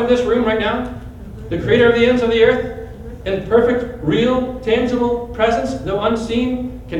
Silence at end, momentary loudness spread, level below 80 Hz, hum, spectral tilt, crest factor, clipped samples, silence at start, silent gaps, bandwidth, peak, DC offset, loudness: 0 s; 15 LU; -36 dBFS; none; -6.5 dB/octave; 16 dB; under 0.1%; 0 s; none; 10 kHz; -2 dBFS; under 0.1%; -17 LUFS